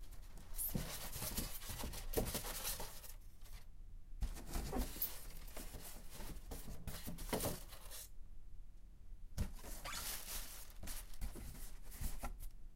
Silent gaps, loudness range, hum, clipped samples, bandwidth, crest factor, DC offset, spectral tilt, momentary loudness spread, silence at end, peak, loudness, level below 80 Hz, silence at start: none; 5 LU; none; under 0.1%; 16 kHz; 20 dB; under 0.1%; -3.5 dB/octave; 18 LU; 0 s; -24 dBFS; -47 LUFS; -50 dBFS; 0 s